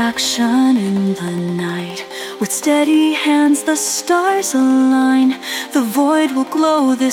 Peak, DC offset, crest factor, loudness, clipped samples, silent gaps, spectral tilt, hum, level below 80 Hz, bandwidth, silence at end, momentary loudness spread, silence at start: -2 dBFS; under 0.1%; 12 dB; -15 LUFS; under 0.1%; none; -4 dB/octave; none; -62 dBFS; 17.5 kHz; 0 s; 9 LU; 0 s